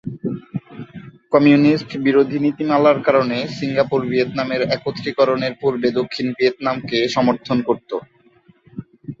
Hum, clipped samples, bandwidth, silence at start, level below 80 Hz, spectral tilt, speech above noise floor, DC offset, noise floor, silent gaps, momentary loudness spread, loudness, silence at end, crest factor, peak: none; under 0.1%; 7.6 kHz; 0.05 s; -58 dBFS; -7 dB/octave; 36 dB; under 0.1%; -53 dBFS; none; 17 LU; -18 LUFS; 0.05 s; 18 dB; -2 dBFS